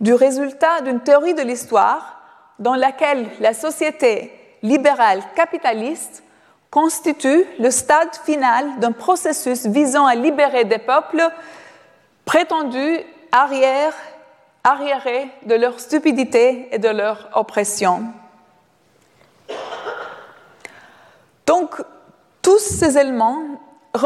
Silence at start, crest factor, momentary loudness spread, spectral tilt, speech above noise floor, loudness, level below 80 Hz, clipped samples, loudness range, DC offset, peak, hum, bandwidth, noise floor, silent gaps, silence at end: 0 s; 16 dB; 14 LU; -3.5 dB/octave; 40 dB; -17 LUFS; -58 dBFS; under 0.1%; 7 LU; under 0.1%; -2 dBFS; none; 14.5 kHz; -57 dBFS; none; 0 s